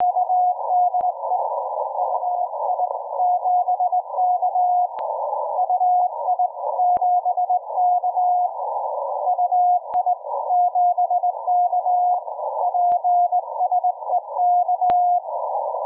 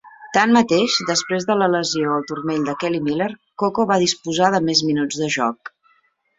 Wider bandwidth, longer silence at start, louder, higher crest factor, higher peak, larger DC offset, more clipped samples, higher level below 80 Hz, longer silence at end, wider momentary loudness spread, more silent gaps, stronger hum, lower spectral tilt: second, 2 kHz vs 8 kHz; about the same, 0 s vs 0.05 s; about the same, -21 LUFS vs -19 LUFS; second, 10 dB vs 18 dB; second, -10 dBFS vs -2 dBFS; neither; neither; second, -72 dBFS vs -60 dBFS; second, 0 s vs 0.7 s; about the same, 6 LU vs 8 LU; neither; neither; first, -7 dB/octave vs -4 dB/octave